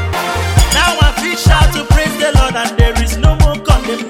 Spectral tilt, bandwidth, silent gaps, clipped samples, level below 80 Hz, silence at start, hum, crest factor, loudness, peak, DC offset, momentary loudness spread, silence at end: -4.5 dB/octave; 17 kHz; none; under 0.1%; -14 dBFS; 0 s; none; 10 dB; -12 LUFS; 0 dBFS; under 0.1%; 4 LU; 0 s